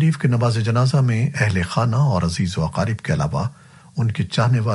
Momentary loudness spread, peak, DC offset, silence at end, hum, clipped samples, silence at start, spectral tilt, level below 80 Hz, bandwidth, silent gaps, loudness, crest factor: 6 LU; -4 dBFS; under 0.1%; 0 s; none; under 0.1%; 0 s; -6.5 dB/octave; -44 dBFS; 11.5 kHz; none; -20 LUFS; 14 dB